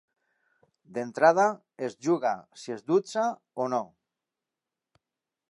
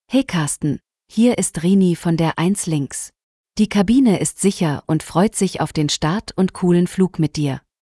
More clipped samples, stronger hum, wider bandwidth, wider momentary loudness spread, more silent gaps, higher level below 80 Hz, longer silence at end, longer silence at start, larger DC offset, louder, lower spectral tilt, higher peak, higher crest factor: neither; neither; about the same, 11 kHz vs 12 kHz; first, 16 LU vs 9 LU; second, none vs 3.23-3.44 s; second, -84 dBFS vs -48 dBFS; first, 1.65 s vs 0.4 s; first, 0.9 s vs 0.1 s; neither; second, -27 LUFS vs -18 LUFS; about the same, -5.5 dB/octave vs -5.5 dB/octave; about the same, -6 dBFS vs -4 dBFS; first, 22 dB vs 14 dB